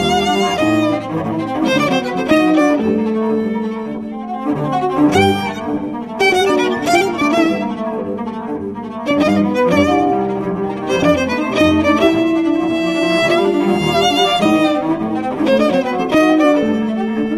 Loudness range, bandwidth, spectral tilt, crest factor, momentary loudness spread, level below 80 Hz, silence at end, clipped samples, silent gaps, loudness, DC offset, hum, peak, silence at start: 3 LU; 14 kHz; -5.5 dB/octave; 14 dB; 9 LU; -42 dBFS; 0 s; under 0.1%; none; -15 LUFS; under 0.1%; none; 0 dBFS; 0 s